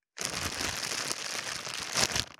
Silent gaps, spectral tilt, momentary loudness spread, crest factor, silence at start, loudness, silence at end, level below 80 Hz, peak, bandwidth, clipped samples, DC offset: none; -1 dB/octave; 7 LU; 28 dB; 0.15 s; -31 LUFS; 0.05 s; -56 dBFS; -6 dBFS; over 20 kHz; under 0.1%; under 0.1%